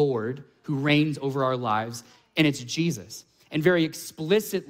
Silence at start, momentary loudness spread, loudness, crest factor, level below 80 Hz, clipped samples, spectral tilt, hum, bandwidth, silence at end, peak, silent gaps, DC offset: 0 s; 14 LU; -26 LUFS; 20 dB; -66 dBFS; under 0.1%; -5.5 dB/octave; none; 16 kHz; 0 s; -6 dBFS; none; under 0.1%